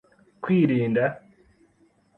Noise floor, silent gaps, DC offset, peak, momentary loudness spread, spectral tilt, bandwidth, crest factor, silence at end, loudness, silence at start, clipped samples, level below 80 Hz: -62 dBFS; none; under 0.1%; -8 dBFS; 16 LU; -10 dB/octave; 4.2 kHz; 18 dB; 1 s; -23 LUFS; 0.4 s; under 0.1%; -64 dBFS